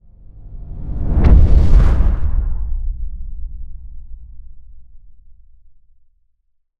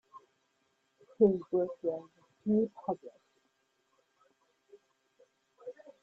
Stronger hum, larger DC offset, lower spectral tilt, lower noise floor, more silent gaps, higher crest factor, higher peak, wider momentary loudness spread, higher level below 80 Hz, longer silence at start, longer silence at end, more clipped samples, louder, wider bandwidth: neither; neither; about the same, -9.5 dB/octave vs -10.5 dB/octave; second, -62 dBFS vs -77 dBFS; neither; second, 16 dB vs 24 dB; first, 0 dBFS vs -14 dBFS; first, 27 LU vs 22 LU; first, -18 dBFS vs -76 dBFS; first, 0.4 s vs 0.15 s; first, 1.45 s vs 0.3 s; neither; first, -17 LUFS vs -32 LUFS; first, 4.7 kHz vs 4.2 kHz